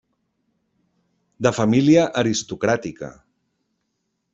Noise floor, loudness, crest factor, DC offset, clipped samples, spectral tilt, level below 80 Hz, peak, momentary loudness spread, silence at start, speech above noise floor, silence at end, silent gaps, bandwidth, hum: -75 dBFS; -19 LUFS; 20 dB; under 0.1%; under 0.1%; -5.5 dB/octave; -58 dBFS; -4 dBFS; 18 LU; 1.4 s; 56 dB; 1.25 s; none; 8 kHz; none